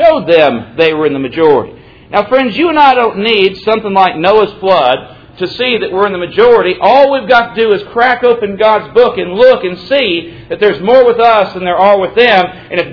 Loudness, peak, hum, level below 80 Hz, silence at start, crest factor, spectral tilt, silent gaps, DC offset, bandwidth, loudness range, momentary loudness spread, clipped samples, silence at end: -9 LUFS; 0 dBFS; none; -44 dBFS; 0 s; 10 dB; -6.5 dB/octave; none; under 0.1%; 5.4 kHz; 1 LU; 7 LU; 2%; 0 s